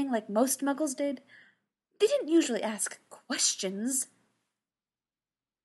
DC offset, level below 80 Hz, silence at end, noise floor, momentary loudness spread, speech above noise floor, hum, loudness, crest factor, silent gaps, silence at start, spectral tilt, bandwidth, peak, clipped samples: under 0.1%; under -90 dBFS; 1.6 s; under -90 dBFS; 9 LU; over 60 dB; none; -29 LUFS; 18 dB; none; 0 s; -2.5 dB/octave; 12.5 kHz; -12 dBFS; under 0.1%